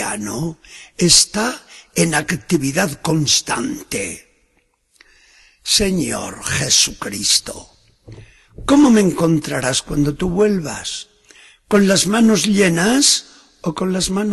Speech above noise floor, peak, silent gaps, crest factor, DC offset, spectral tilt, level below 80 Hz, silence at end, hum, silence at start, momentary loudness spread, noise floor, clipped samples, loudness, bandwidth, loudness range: 46 dB; 0 dBFS; none; 18 dB; under 0.1%; -3.5 dB/octave; -42 dBFS; 0 s; none; 0 s; 15 LU; -62 dBFS; under 0.1%; -16 LUFS; 13 kHz; 4 LU